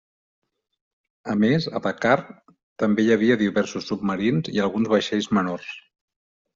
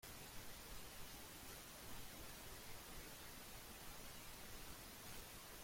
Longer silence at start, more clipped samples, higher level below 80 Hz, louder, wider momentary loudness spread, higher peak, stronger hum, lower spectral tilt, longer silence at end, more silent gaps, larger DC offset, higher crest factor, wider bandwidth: first, 1.25 s vs 0 s; neither; about the same, -62 dBFS vs -64 dBFS; first, -22 LUFS vs -55 LUFS; first, 9 LU vs 1 LU; first, -4 dBFS vs -38 dBFS; neither; first, -5 dB/octave vs -2.5 dB/octave; first, 0.75 s vs 0 s; first, 2.63-2.76 s vs none; neither; about the same, 20 dB vs 16 dB; second, 7.6 kHz vs 16.5 kHz